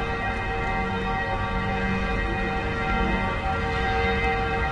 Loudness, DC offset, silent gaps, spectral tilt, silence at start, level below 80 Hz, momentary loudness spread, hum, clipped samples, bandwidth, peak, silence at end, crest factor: -25 LUFS; under 0.1%; none; -6.5 dB/octave; 0 s; -32 dBFS; 3 LU; none; under 0.1%; 10.5 kHz; -10 dBFS; 0 s; 14 dB